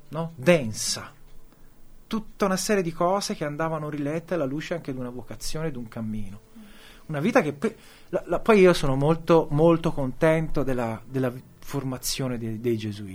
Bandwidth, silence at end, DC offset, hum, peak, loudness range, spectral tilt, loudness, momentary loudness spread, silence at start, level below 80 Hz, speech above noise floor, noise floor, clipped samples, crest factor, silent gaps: over 20 kHz; 0 s; under 0.1%; none; -4 dBFS; 8 LU; -5.5 dB/octave; -25 LUFS; 13 LU; 0.05 s; -40 dBFS; 22 dB; -46 dBFS; under 0.1%; 20 dB; none